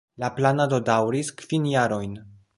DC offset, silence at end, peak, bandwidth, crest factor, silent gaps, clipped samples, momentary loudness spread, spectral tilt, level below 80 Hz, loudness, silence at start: under 0.1%; 0.25 s; -4 dBFS; 11.5 kHz; 20 dB; none; under 0.1%; 9 LU; -6 dB/octave; -58 dBFS; -24 LUFS; 0.2 s